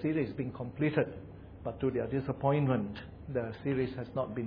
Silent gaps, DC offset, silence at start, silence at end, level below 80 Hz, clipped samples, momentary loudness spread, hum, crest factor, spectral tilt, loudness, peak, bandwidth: none; under 0.1%; 0 s; 0 s; -56 dBFS; under 0.1%; 12 LU; none; 18 dB; -11 dB/octave; -34 LUFS; -14 dBFS; 5.2 kHz